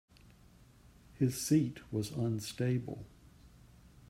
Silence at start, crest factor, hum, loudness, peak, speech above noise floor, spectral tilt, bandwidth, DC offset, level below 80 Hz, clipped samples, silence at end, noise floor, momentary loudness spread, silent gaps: 1.15 s; 20 dB; none; -35 LUFS; -18 dBFS; 27 dB; -6 dB/octave; 16 kHz; under 0.1%; -62 dBFS; under 0.1%; 0.6 s; -61 dBFS; 15 LU; none